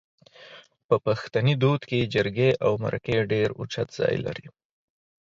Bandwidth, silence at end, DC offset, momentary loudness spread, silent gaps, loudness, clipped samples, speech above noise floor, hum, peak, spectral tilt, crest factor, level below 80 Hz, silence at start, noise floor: 7.6 kHz; 0.8 s; under 0.1%; 8 LU; 0.84-0.89 s; -25 LUFS; under 0.1%; 25 dB; none; -8 dBFS; -7 dB/octave; 18 dB; -56 dBFS; 0.4 s; -50 dBFS